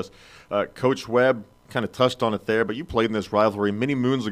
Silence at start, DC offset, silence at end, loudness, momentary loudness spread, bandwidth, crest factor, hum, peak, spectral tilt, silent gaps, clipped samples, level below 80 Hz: 0 s; under 0.1%; 0 s; -23 LUFS; 8 LU; 15 kHz; 18 dB; none; -6 dBFS; -6 dB/octave; none; under 0.1%; -54 dBFS